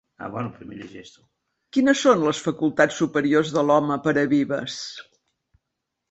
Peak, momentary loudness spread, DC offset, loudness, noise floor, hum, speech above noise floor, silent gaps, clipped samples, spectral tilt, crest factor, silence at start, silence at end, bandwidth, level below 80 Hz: -4 dBFS; 19 LU; under 0.1%; -21 LUFS; -81 dBFS; none; 59 dB; none; under 0.1%; -5 dB/octave; 20 dB; 0.2 s; 1.1 s; 8.2 kHz; -62 dBFS